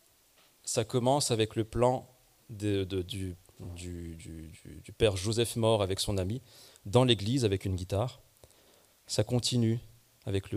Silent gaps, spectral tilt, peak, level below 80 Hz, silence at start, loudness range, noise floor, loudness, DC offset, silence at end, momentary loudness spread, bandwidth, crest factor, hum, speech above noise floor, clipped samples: none; -5 dB/octave; -10 dBFS; -54 dBFS; 0.65 s; 5 LU; -64 dBFS; -30 LUFS; under 0.1%; 0 s; 18 LU; 15.5 kHz; 22 dB; none; 34 dB; under 0.1%